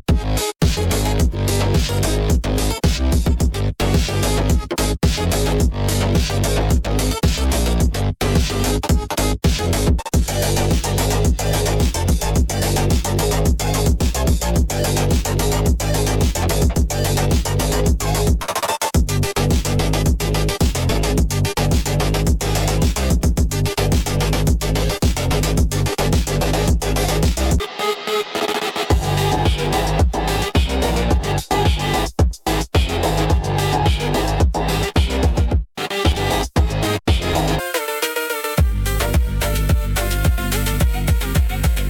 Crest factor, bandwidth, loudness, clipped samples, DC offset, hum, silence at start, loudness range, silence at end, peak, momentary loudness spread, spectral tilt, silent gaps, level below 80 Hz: 14 dB; 17.5 kHz; -19 LUFS; under 0.1%; under 0.1%; none; 0.1 s; 1 LU; 0 s; -4 dBFS; 2 LU; -5 dB/octave; none; -22 dBFS